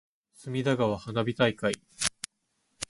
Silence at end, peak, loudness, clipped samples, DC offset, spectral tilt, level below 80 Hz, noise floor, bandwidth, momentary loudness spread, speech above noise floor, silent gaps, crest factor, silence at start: 0.05 s; -6 dBFS; -29 LUFS; under 0.1%; under 0.1%; -4.5 dB/octave; -60 dBFS; -76 dBFS; 11.5 kHz; 15 LU; 48 dB; none; 24 dB; 0.4 s